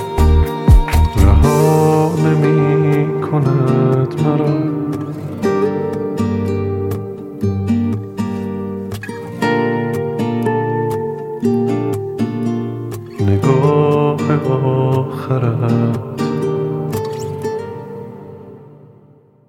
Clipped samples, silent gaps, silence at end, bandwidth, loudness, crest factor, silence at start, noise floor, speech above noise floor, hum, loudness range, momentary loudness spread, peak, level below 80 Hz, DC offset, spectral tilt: under 0.1%; none; 0.7 s; 16.5 kHz; -16 LUFS; 14 dB; 0 s; -47 dBFS; 34 dB; none; 7 LU; 12 LU; 0 dBFS; -24 dBFS; under 0.1%; -8 dB/octave